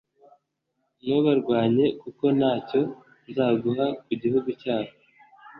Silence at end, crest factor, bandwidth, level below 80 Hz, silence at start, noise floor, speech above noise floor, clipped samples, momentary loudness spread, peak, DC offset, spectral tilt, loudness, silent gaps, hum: 0 s; 16 dB; 5.4 kHz; -66 dBFS; 1.05 s; -77 dBFS; 53 dB; under 0.1%; 8 LU; -8 dBFS; under 0.1%; -10 dB/octave; -25 LUFS; none; none